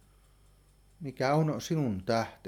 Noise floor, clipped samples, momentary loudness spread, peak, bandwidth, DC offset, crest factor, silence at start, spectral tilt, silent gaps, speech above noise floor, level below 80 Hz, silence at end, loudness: -62 dBFS; under 0.1%; 13 LU; -14 dBFS; 16.5 kHz; under 0.1%; 18 dB; 1 s; -6.5 dB/octave; none; 31 dB; -62 dBFS; 0 s; -30 LUFS